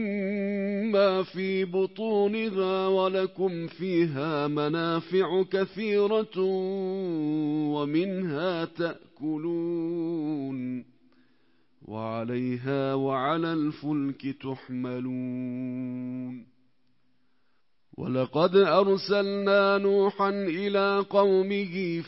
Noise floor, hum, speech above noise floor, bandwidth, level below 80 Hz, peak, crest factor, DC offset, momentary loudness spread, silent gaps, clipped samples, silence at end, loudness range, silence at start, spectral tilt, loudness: -76 dBFS; none; 49 dB; 5.8 kHz; -74 dBFS; -8 dBFS; 18 dB; under 0.1%; 11 LU; none; under 0.1%; 0 s; 9 LU; 0 s; -10.5 dB/octave; -27 LUFS